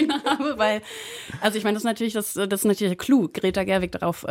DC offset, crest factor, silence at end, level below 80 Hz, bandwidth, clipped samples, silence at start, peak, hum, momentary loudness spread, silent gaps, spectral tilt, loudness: under 0.1%; 18 dB; 0 s; -54 dBFS; 16.5 kHz; under 0.1%; 0 s; -6 dBFS; none; 7 LU; none; -4.5 dB/octave; -23 LUFS